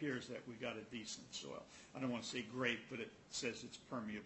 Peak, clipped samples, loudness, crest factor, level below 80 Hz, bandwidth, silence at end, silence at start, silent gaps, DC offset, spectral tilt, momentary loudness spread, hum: -22 dBFS; under 0.1%; -46 LUFS; 24 dB; -78 dBFS; 8.2 kHz; 0 s; 0 s; none; under 0.1%; -3.5 dB/octave; 10 LU; none